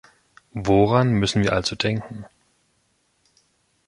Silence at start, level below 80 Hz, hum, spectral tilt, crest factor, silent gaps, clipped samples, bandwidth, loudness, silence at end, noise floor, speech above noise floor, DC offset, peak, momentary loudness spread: 0.55 s; -46 dBFS; none; -6 dB/octave; 20 dB; none; under 0.1%; 11.5 kHz; -21 LUFS; 1.65 s; -67 dBFS; 47 dB; under 0.1%; -4 dBFS; 19 LU